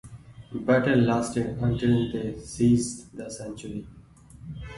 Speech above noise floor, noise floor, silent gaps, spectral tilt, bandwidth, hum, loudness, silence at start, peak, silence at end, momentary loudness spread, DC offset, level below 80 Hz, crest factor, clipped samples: 22 dB; -48 dBFS; none; -6.5 dB/octave; 11.5 kHz; none; -25 LUFS; 0.05 s; -10 dBFS; 0 s; 17 LU; under 0.1%; -48 dBFS; 18 dB; under 0.1%